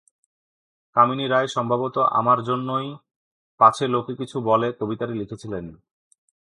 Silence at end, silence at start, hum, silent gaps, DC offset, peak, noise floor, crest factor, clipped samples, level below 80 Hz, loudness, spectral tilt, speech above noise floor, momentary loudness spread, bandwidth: 0.85 s; 0.95 s; none; 3.16-3.58 s; under 0.1%; -2 dBFS; under -90 dBFS; 22 dB; under 0.1%; -62 dBFS; -22 LUFS; -6 dB/octave; over 68 dB; 14 LU; 11.5 kHz